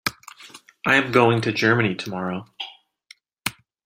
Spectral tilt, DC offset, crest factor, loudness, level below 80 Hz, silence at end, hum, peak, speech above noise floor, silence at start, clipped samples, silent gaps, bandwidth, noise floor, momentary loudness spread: -5 dB/octave; under 0.1%; 22 dB; -21 LUFS; -62 dBFS; 0.35 s; none; -2 dBFS; 33 dB; 0.05 s; under 0.1%; none; 16 kHz; -53 dBFS; 18 LU